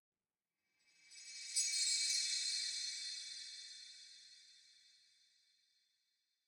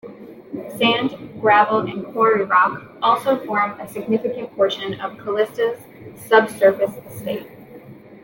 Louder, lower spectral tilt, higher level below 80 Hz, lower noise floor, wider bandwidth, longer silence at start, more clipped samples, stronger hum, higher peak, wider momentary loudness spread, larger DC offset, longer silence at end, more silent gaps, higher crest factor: second, -38 LUFS vs -19 LUFS; second, 6 dB/octave vs -5 dB/octave; second, under -90 dBFS vs -64 dBFS; first, under -90 dBFS vs -41 dBFS; first, 19.5 kHz vs 17 kHz; first, 1.05 s vs 0.05 s; neither; neither; second, -24 dBFS vs -2 dBFS; first, 22 LU vs 16 LU; neither; first, 1.75 s vs 0.05 s; neither; about the same, 22 dB vs 18 dB